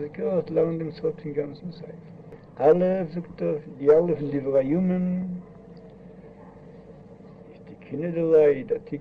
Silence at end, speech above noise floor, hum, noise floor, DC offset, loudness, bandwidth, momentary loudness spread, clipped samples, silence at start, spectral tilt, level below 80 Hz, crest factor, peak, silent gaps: 0 s; 22 dB; none; -46 dBFS; under 0.1%; -24 LUFS; 5 kHz; 25 LU; under 0.1%; 0 s; -10.5 dB/octave; -60 dBFS; 20 dB; -6 dBFS; none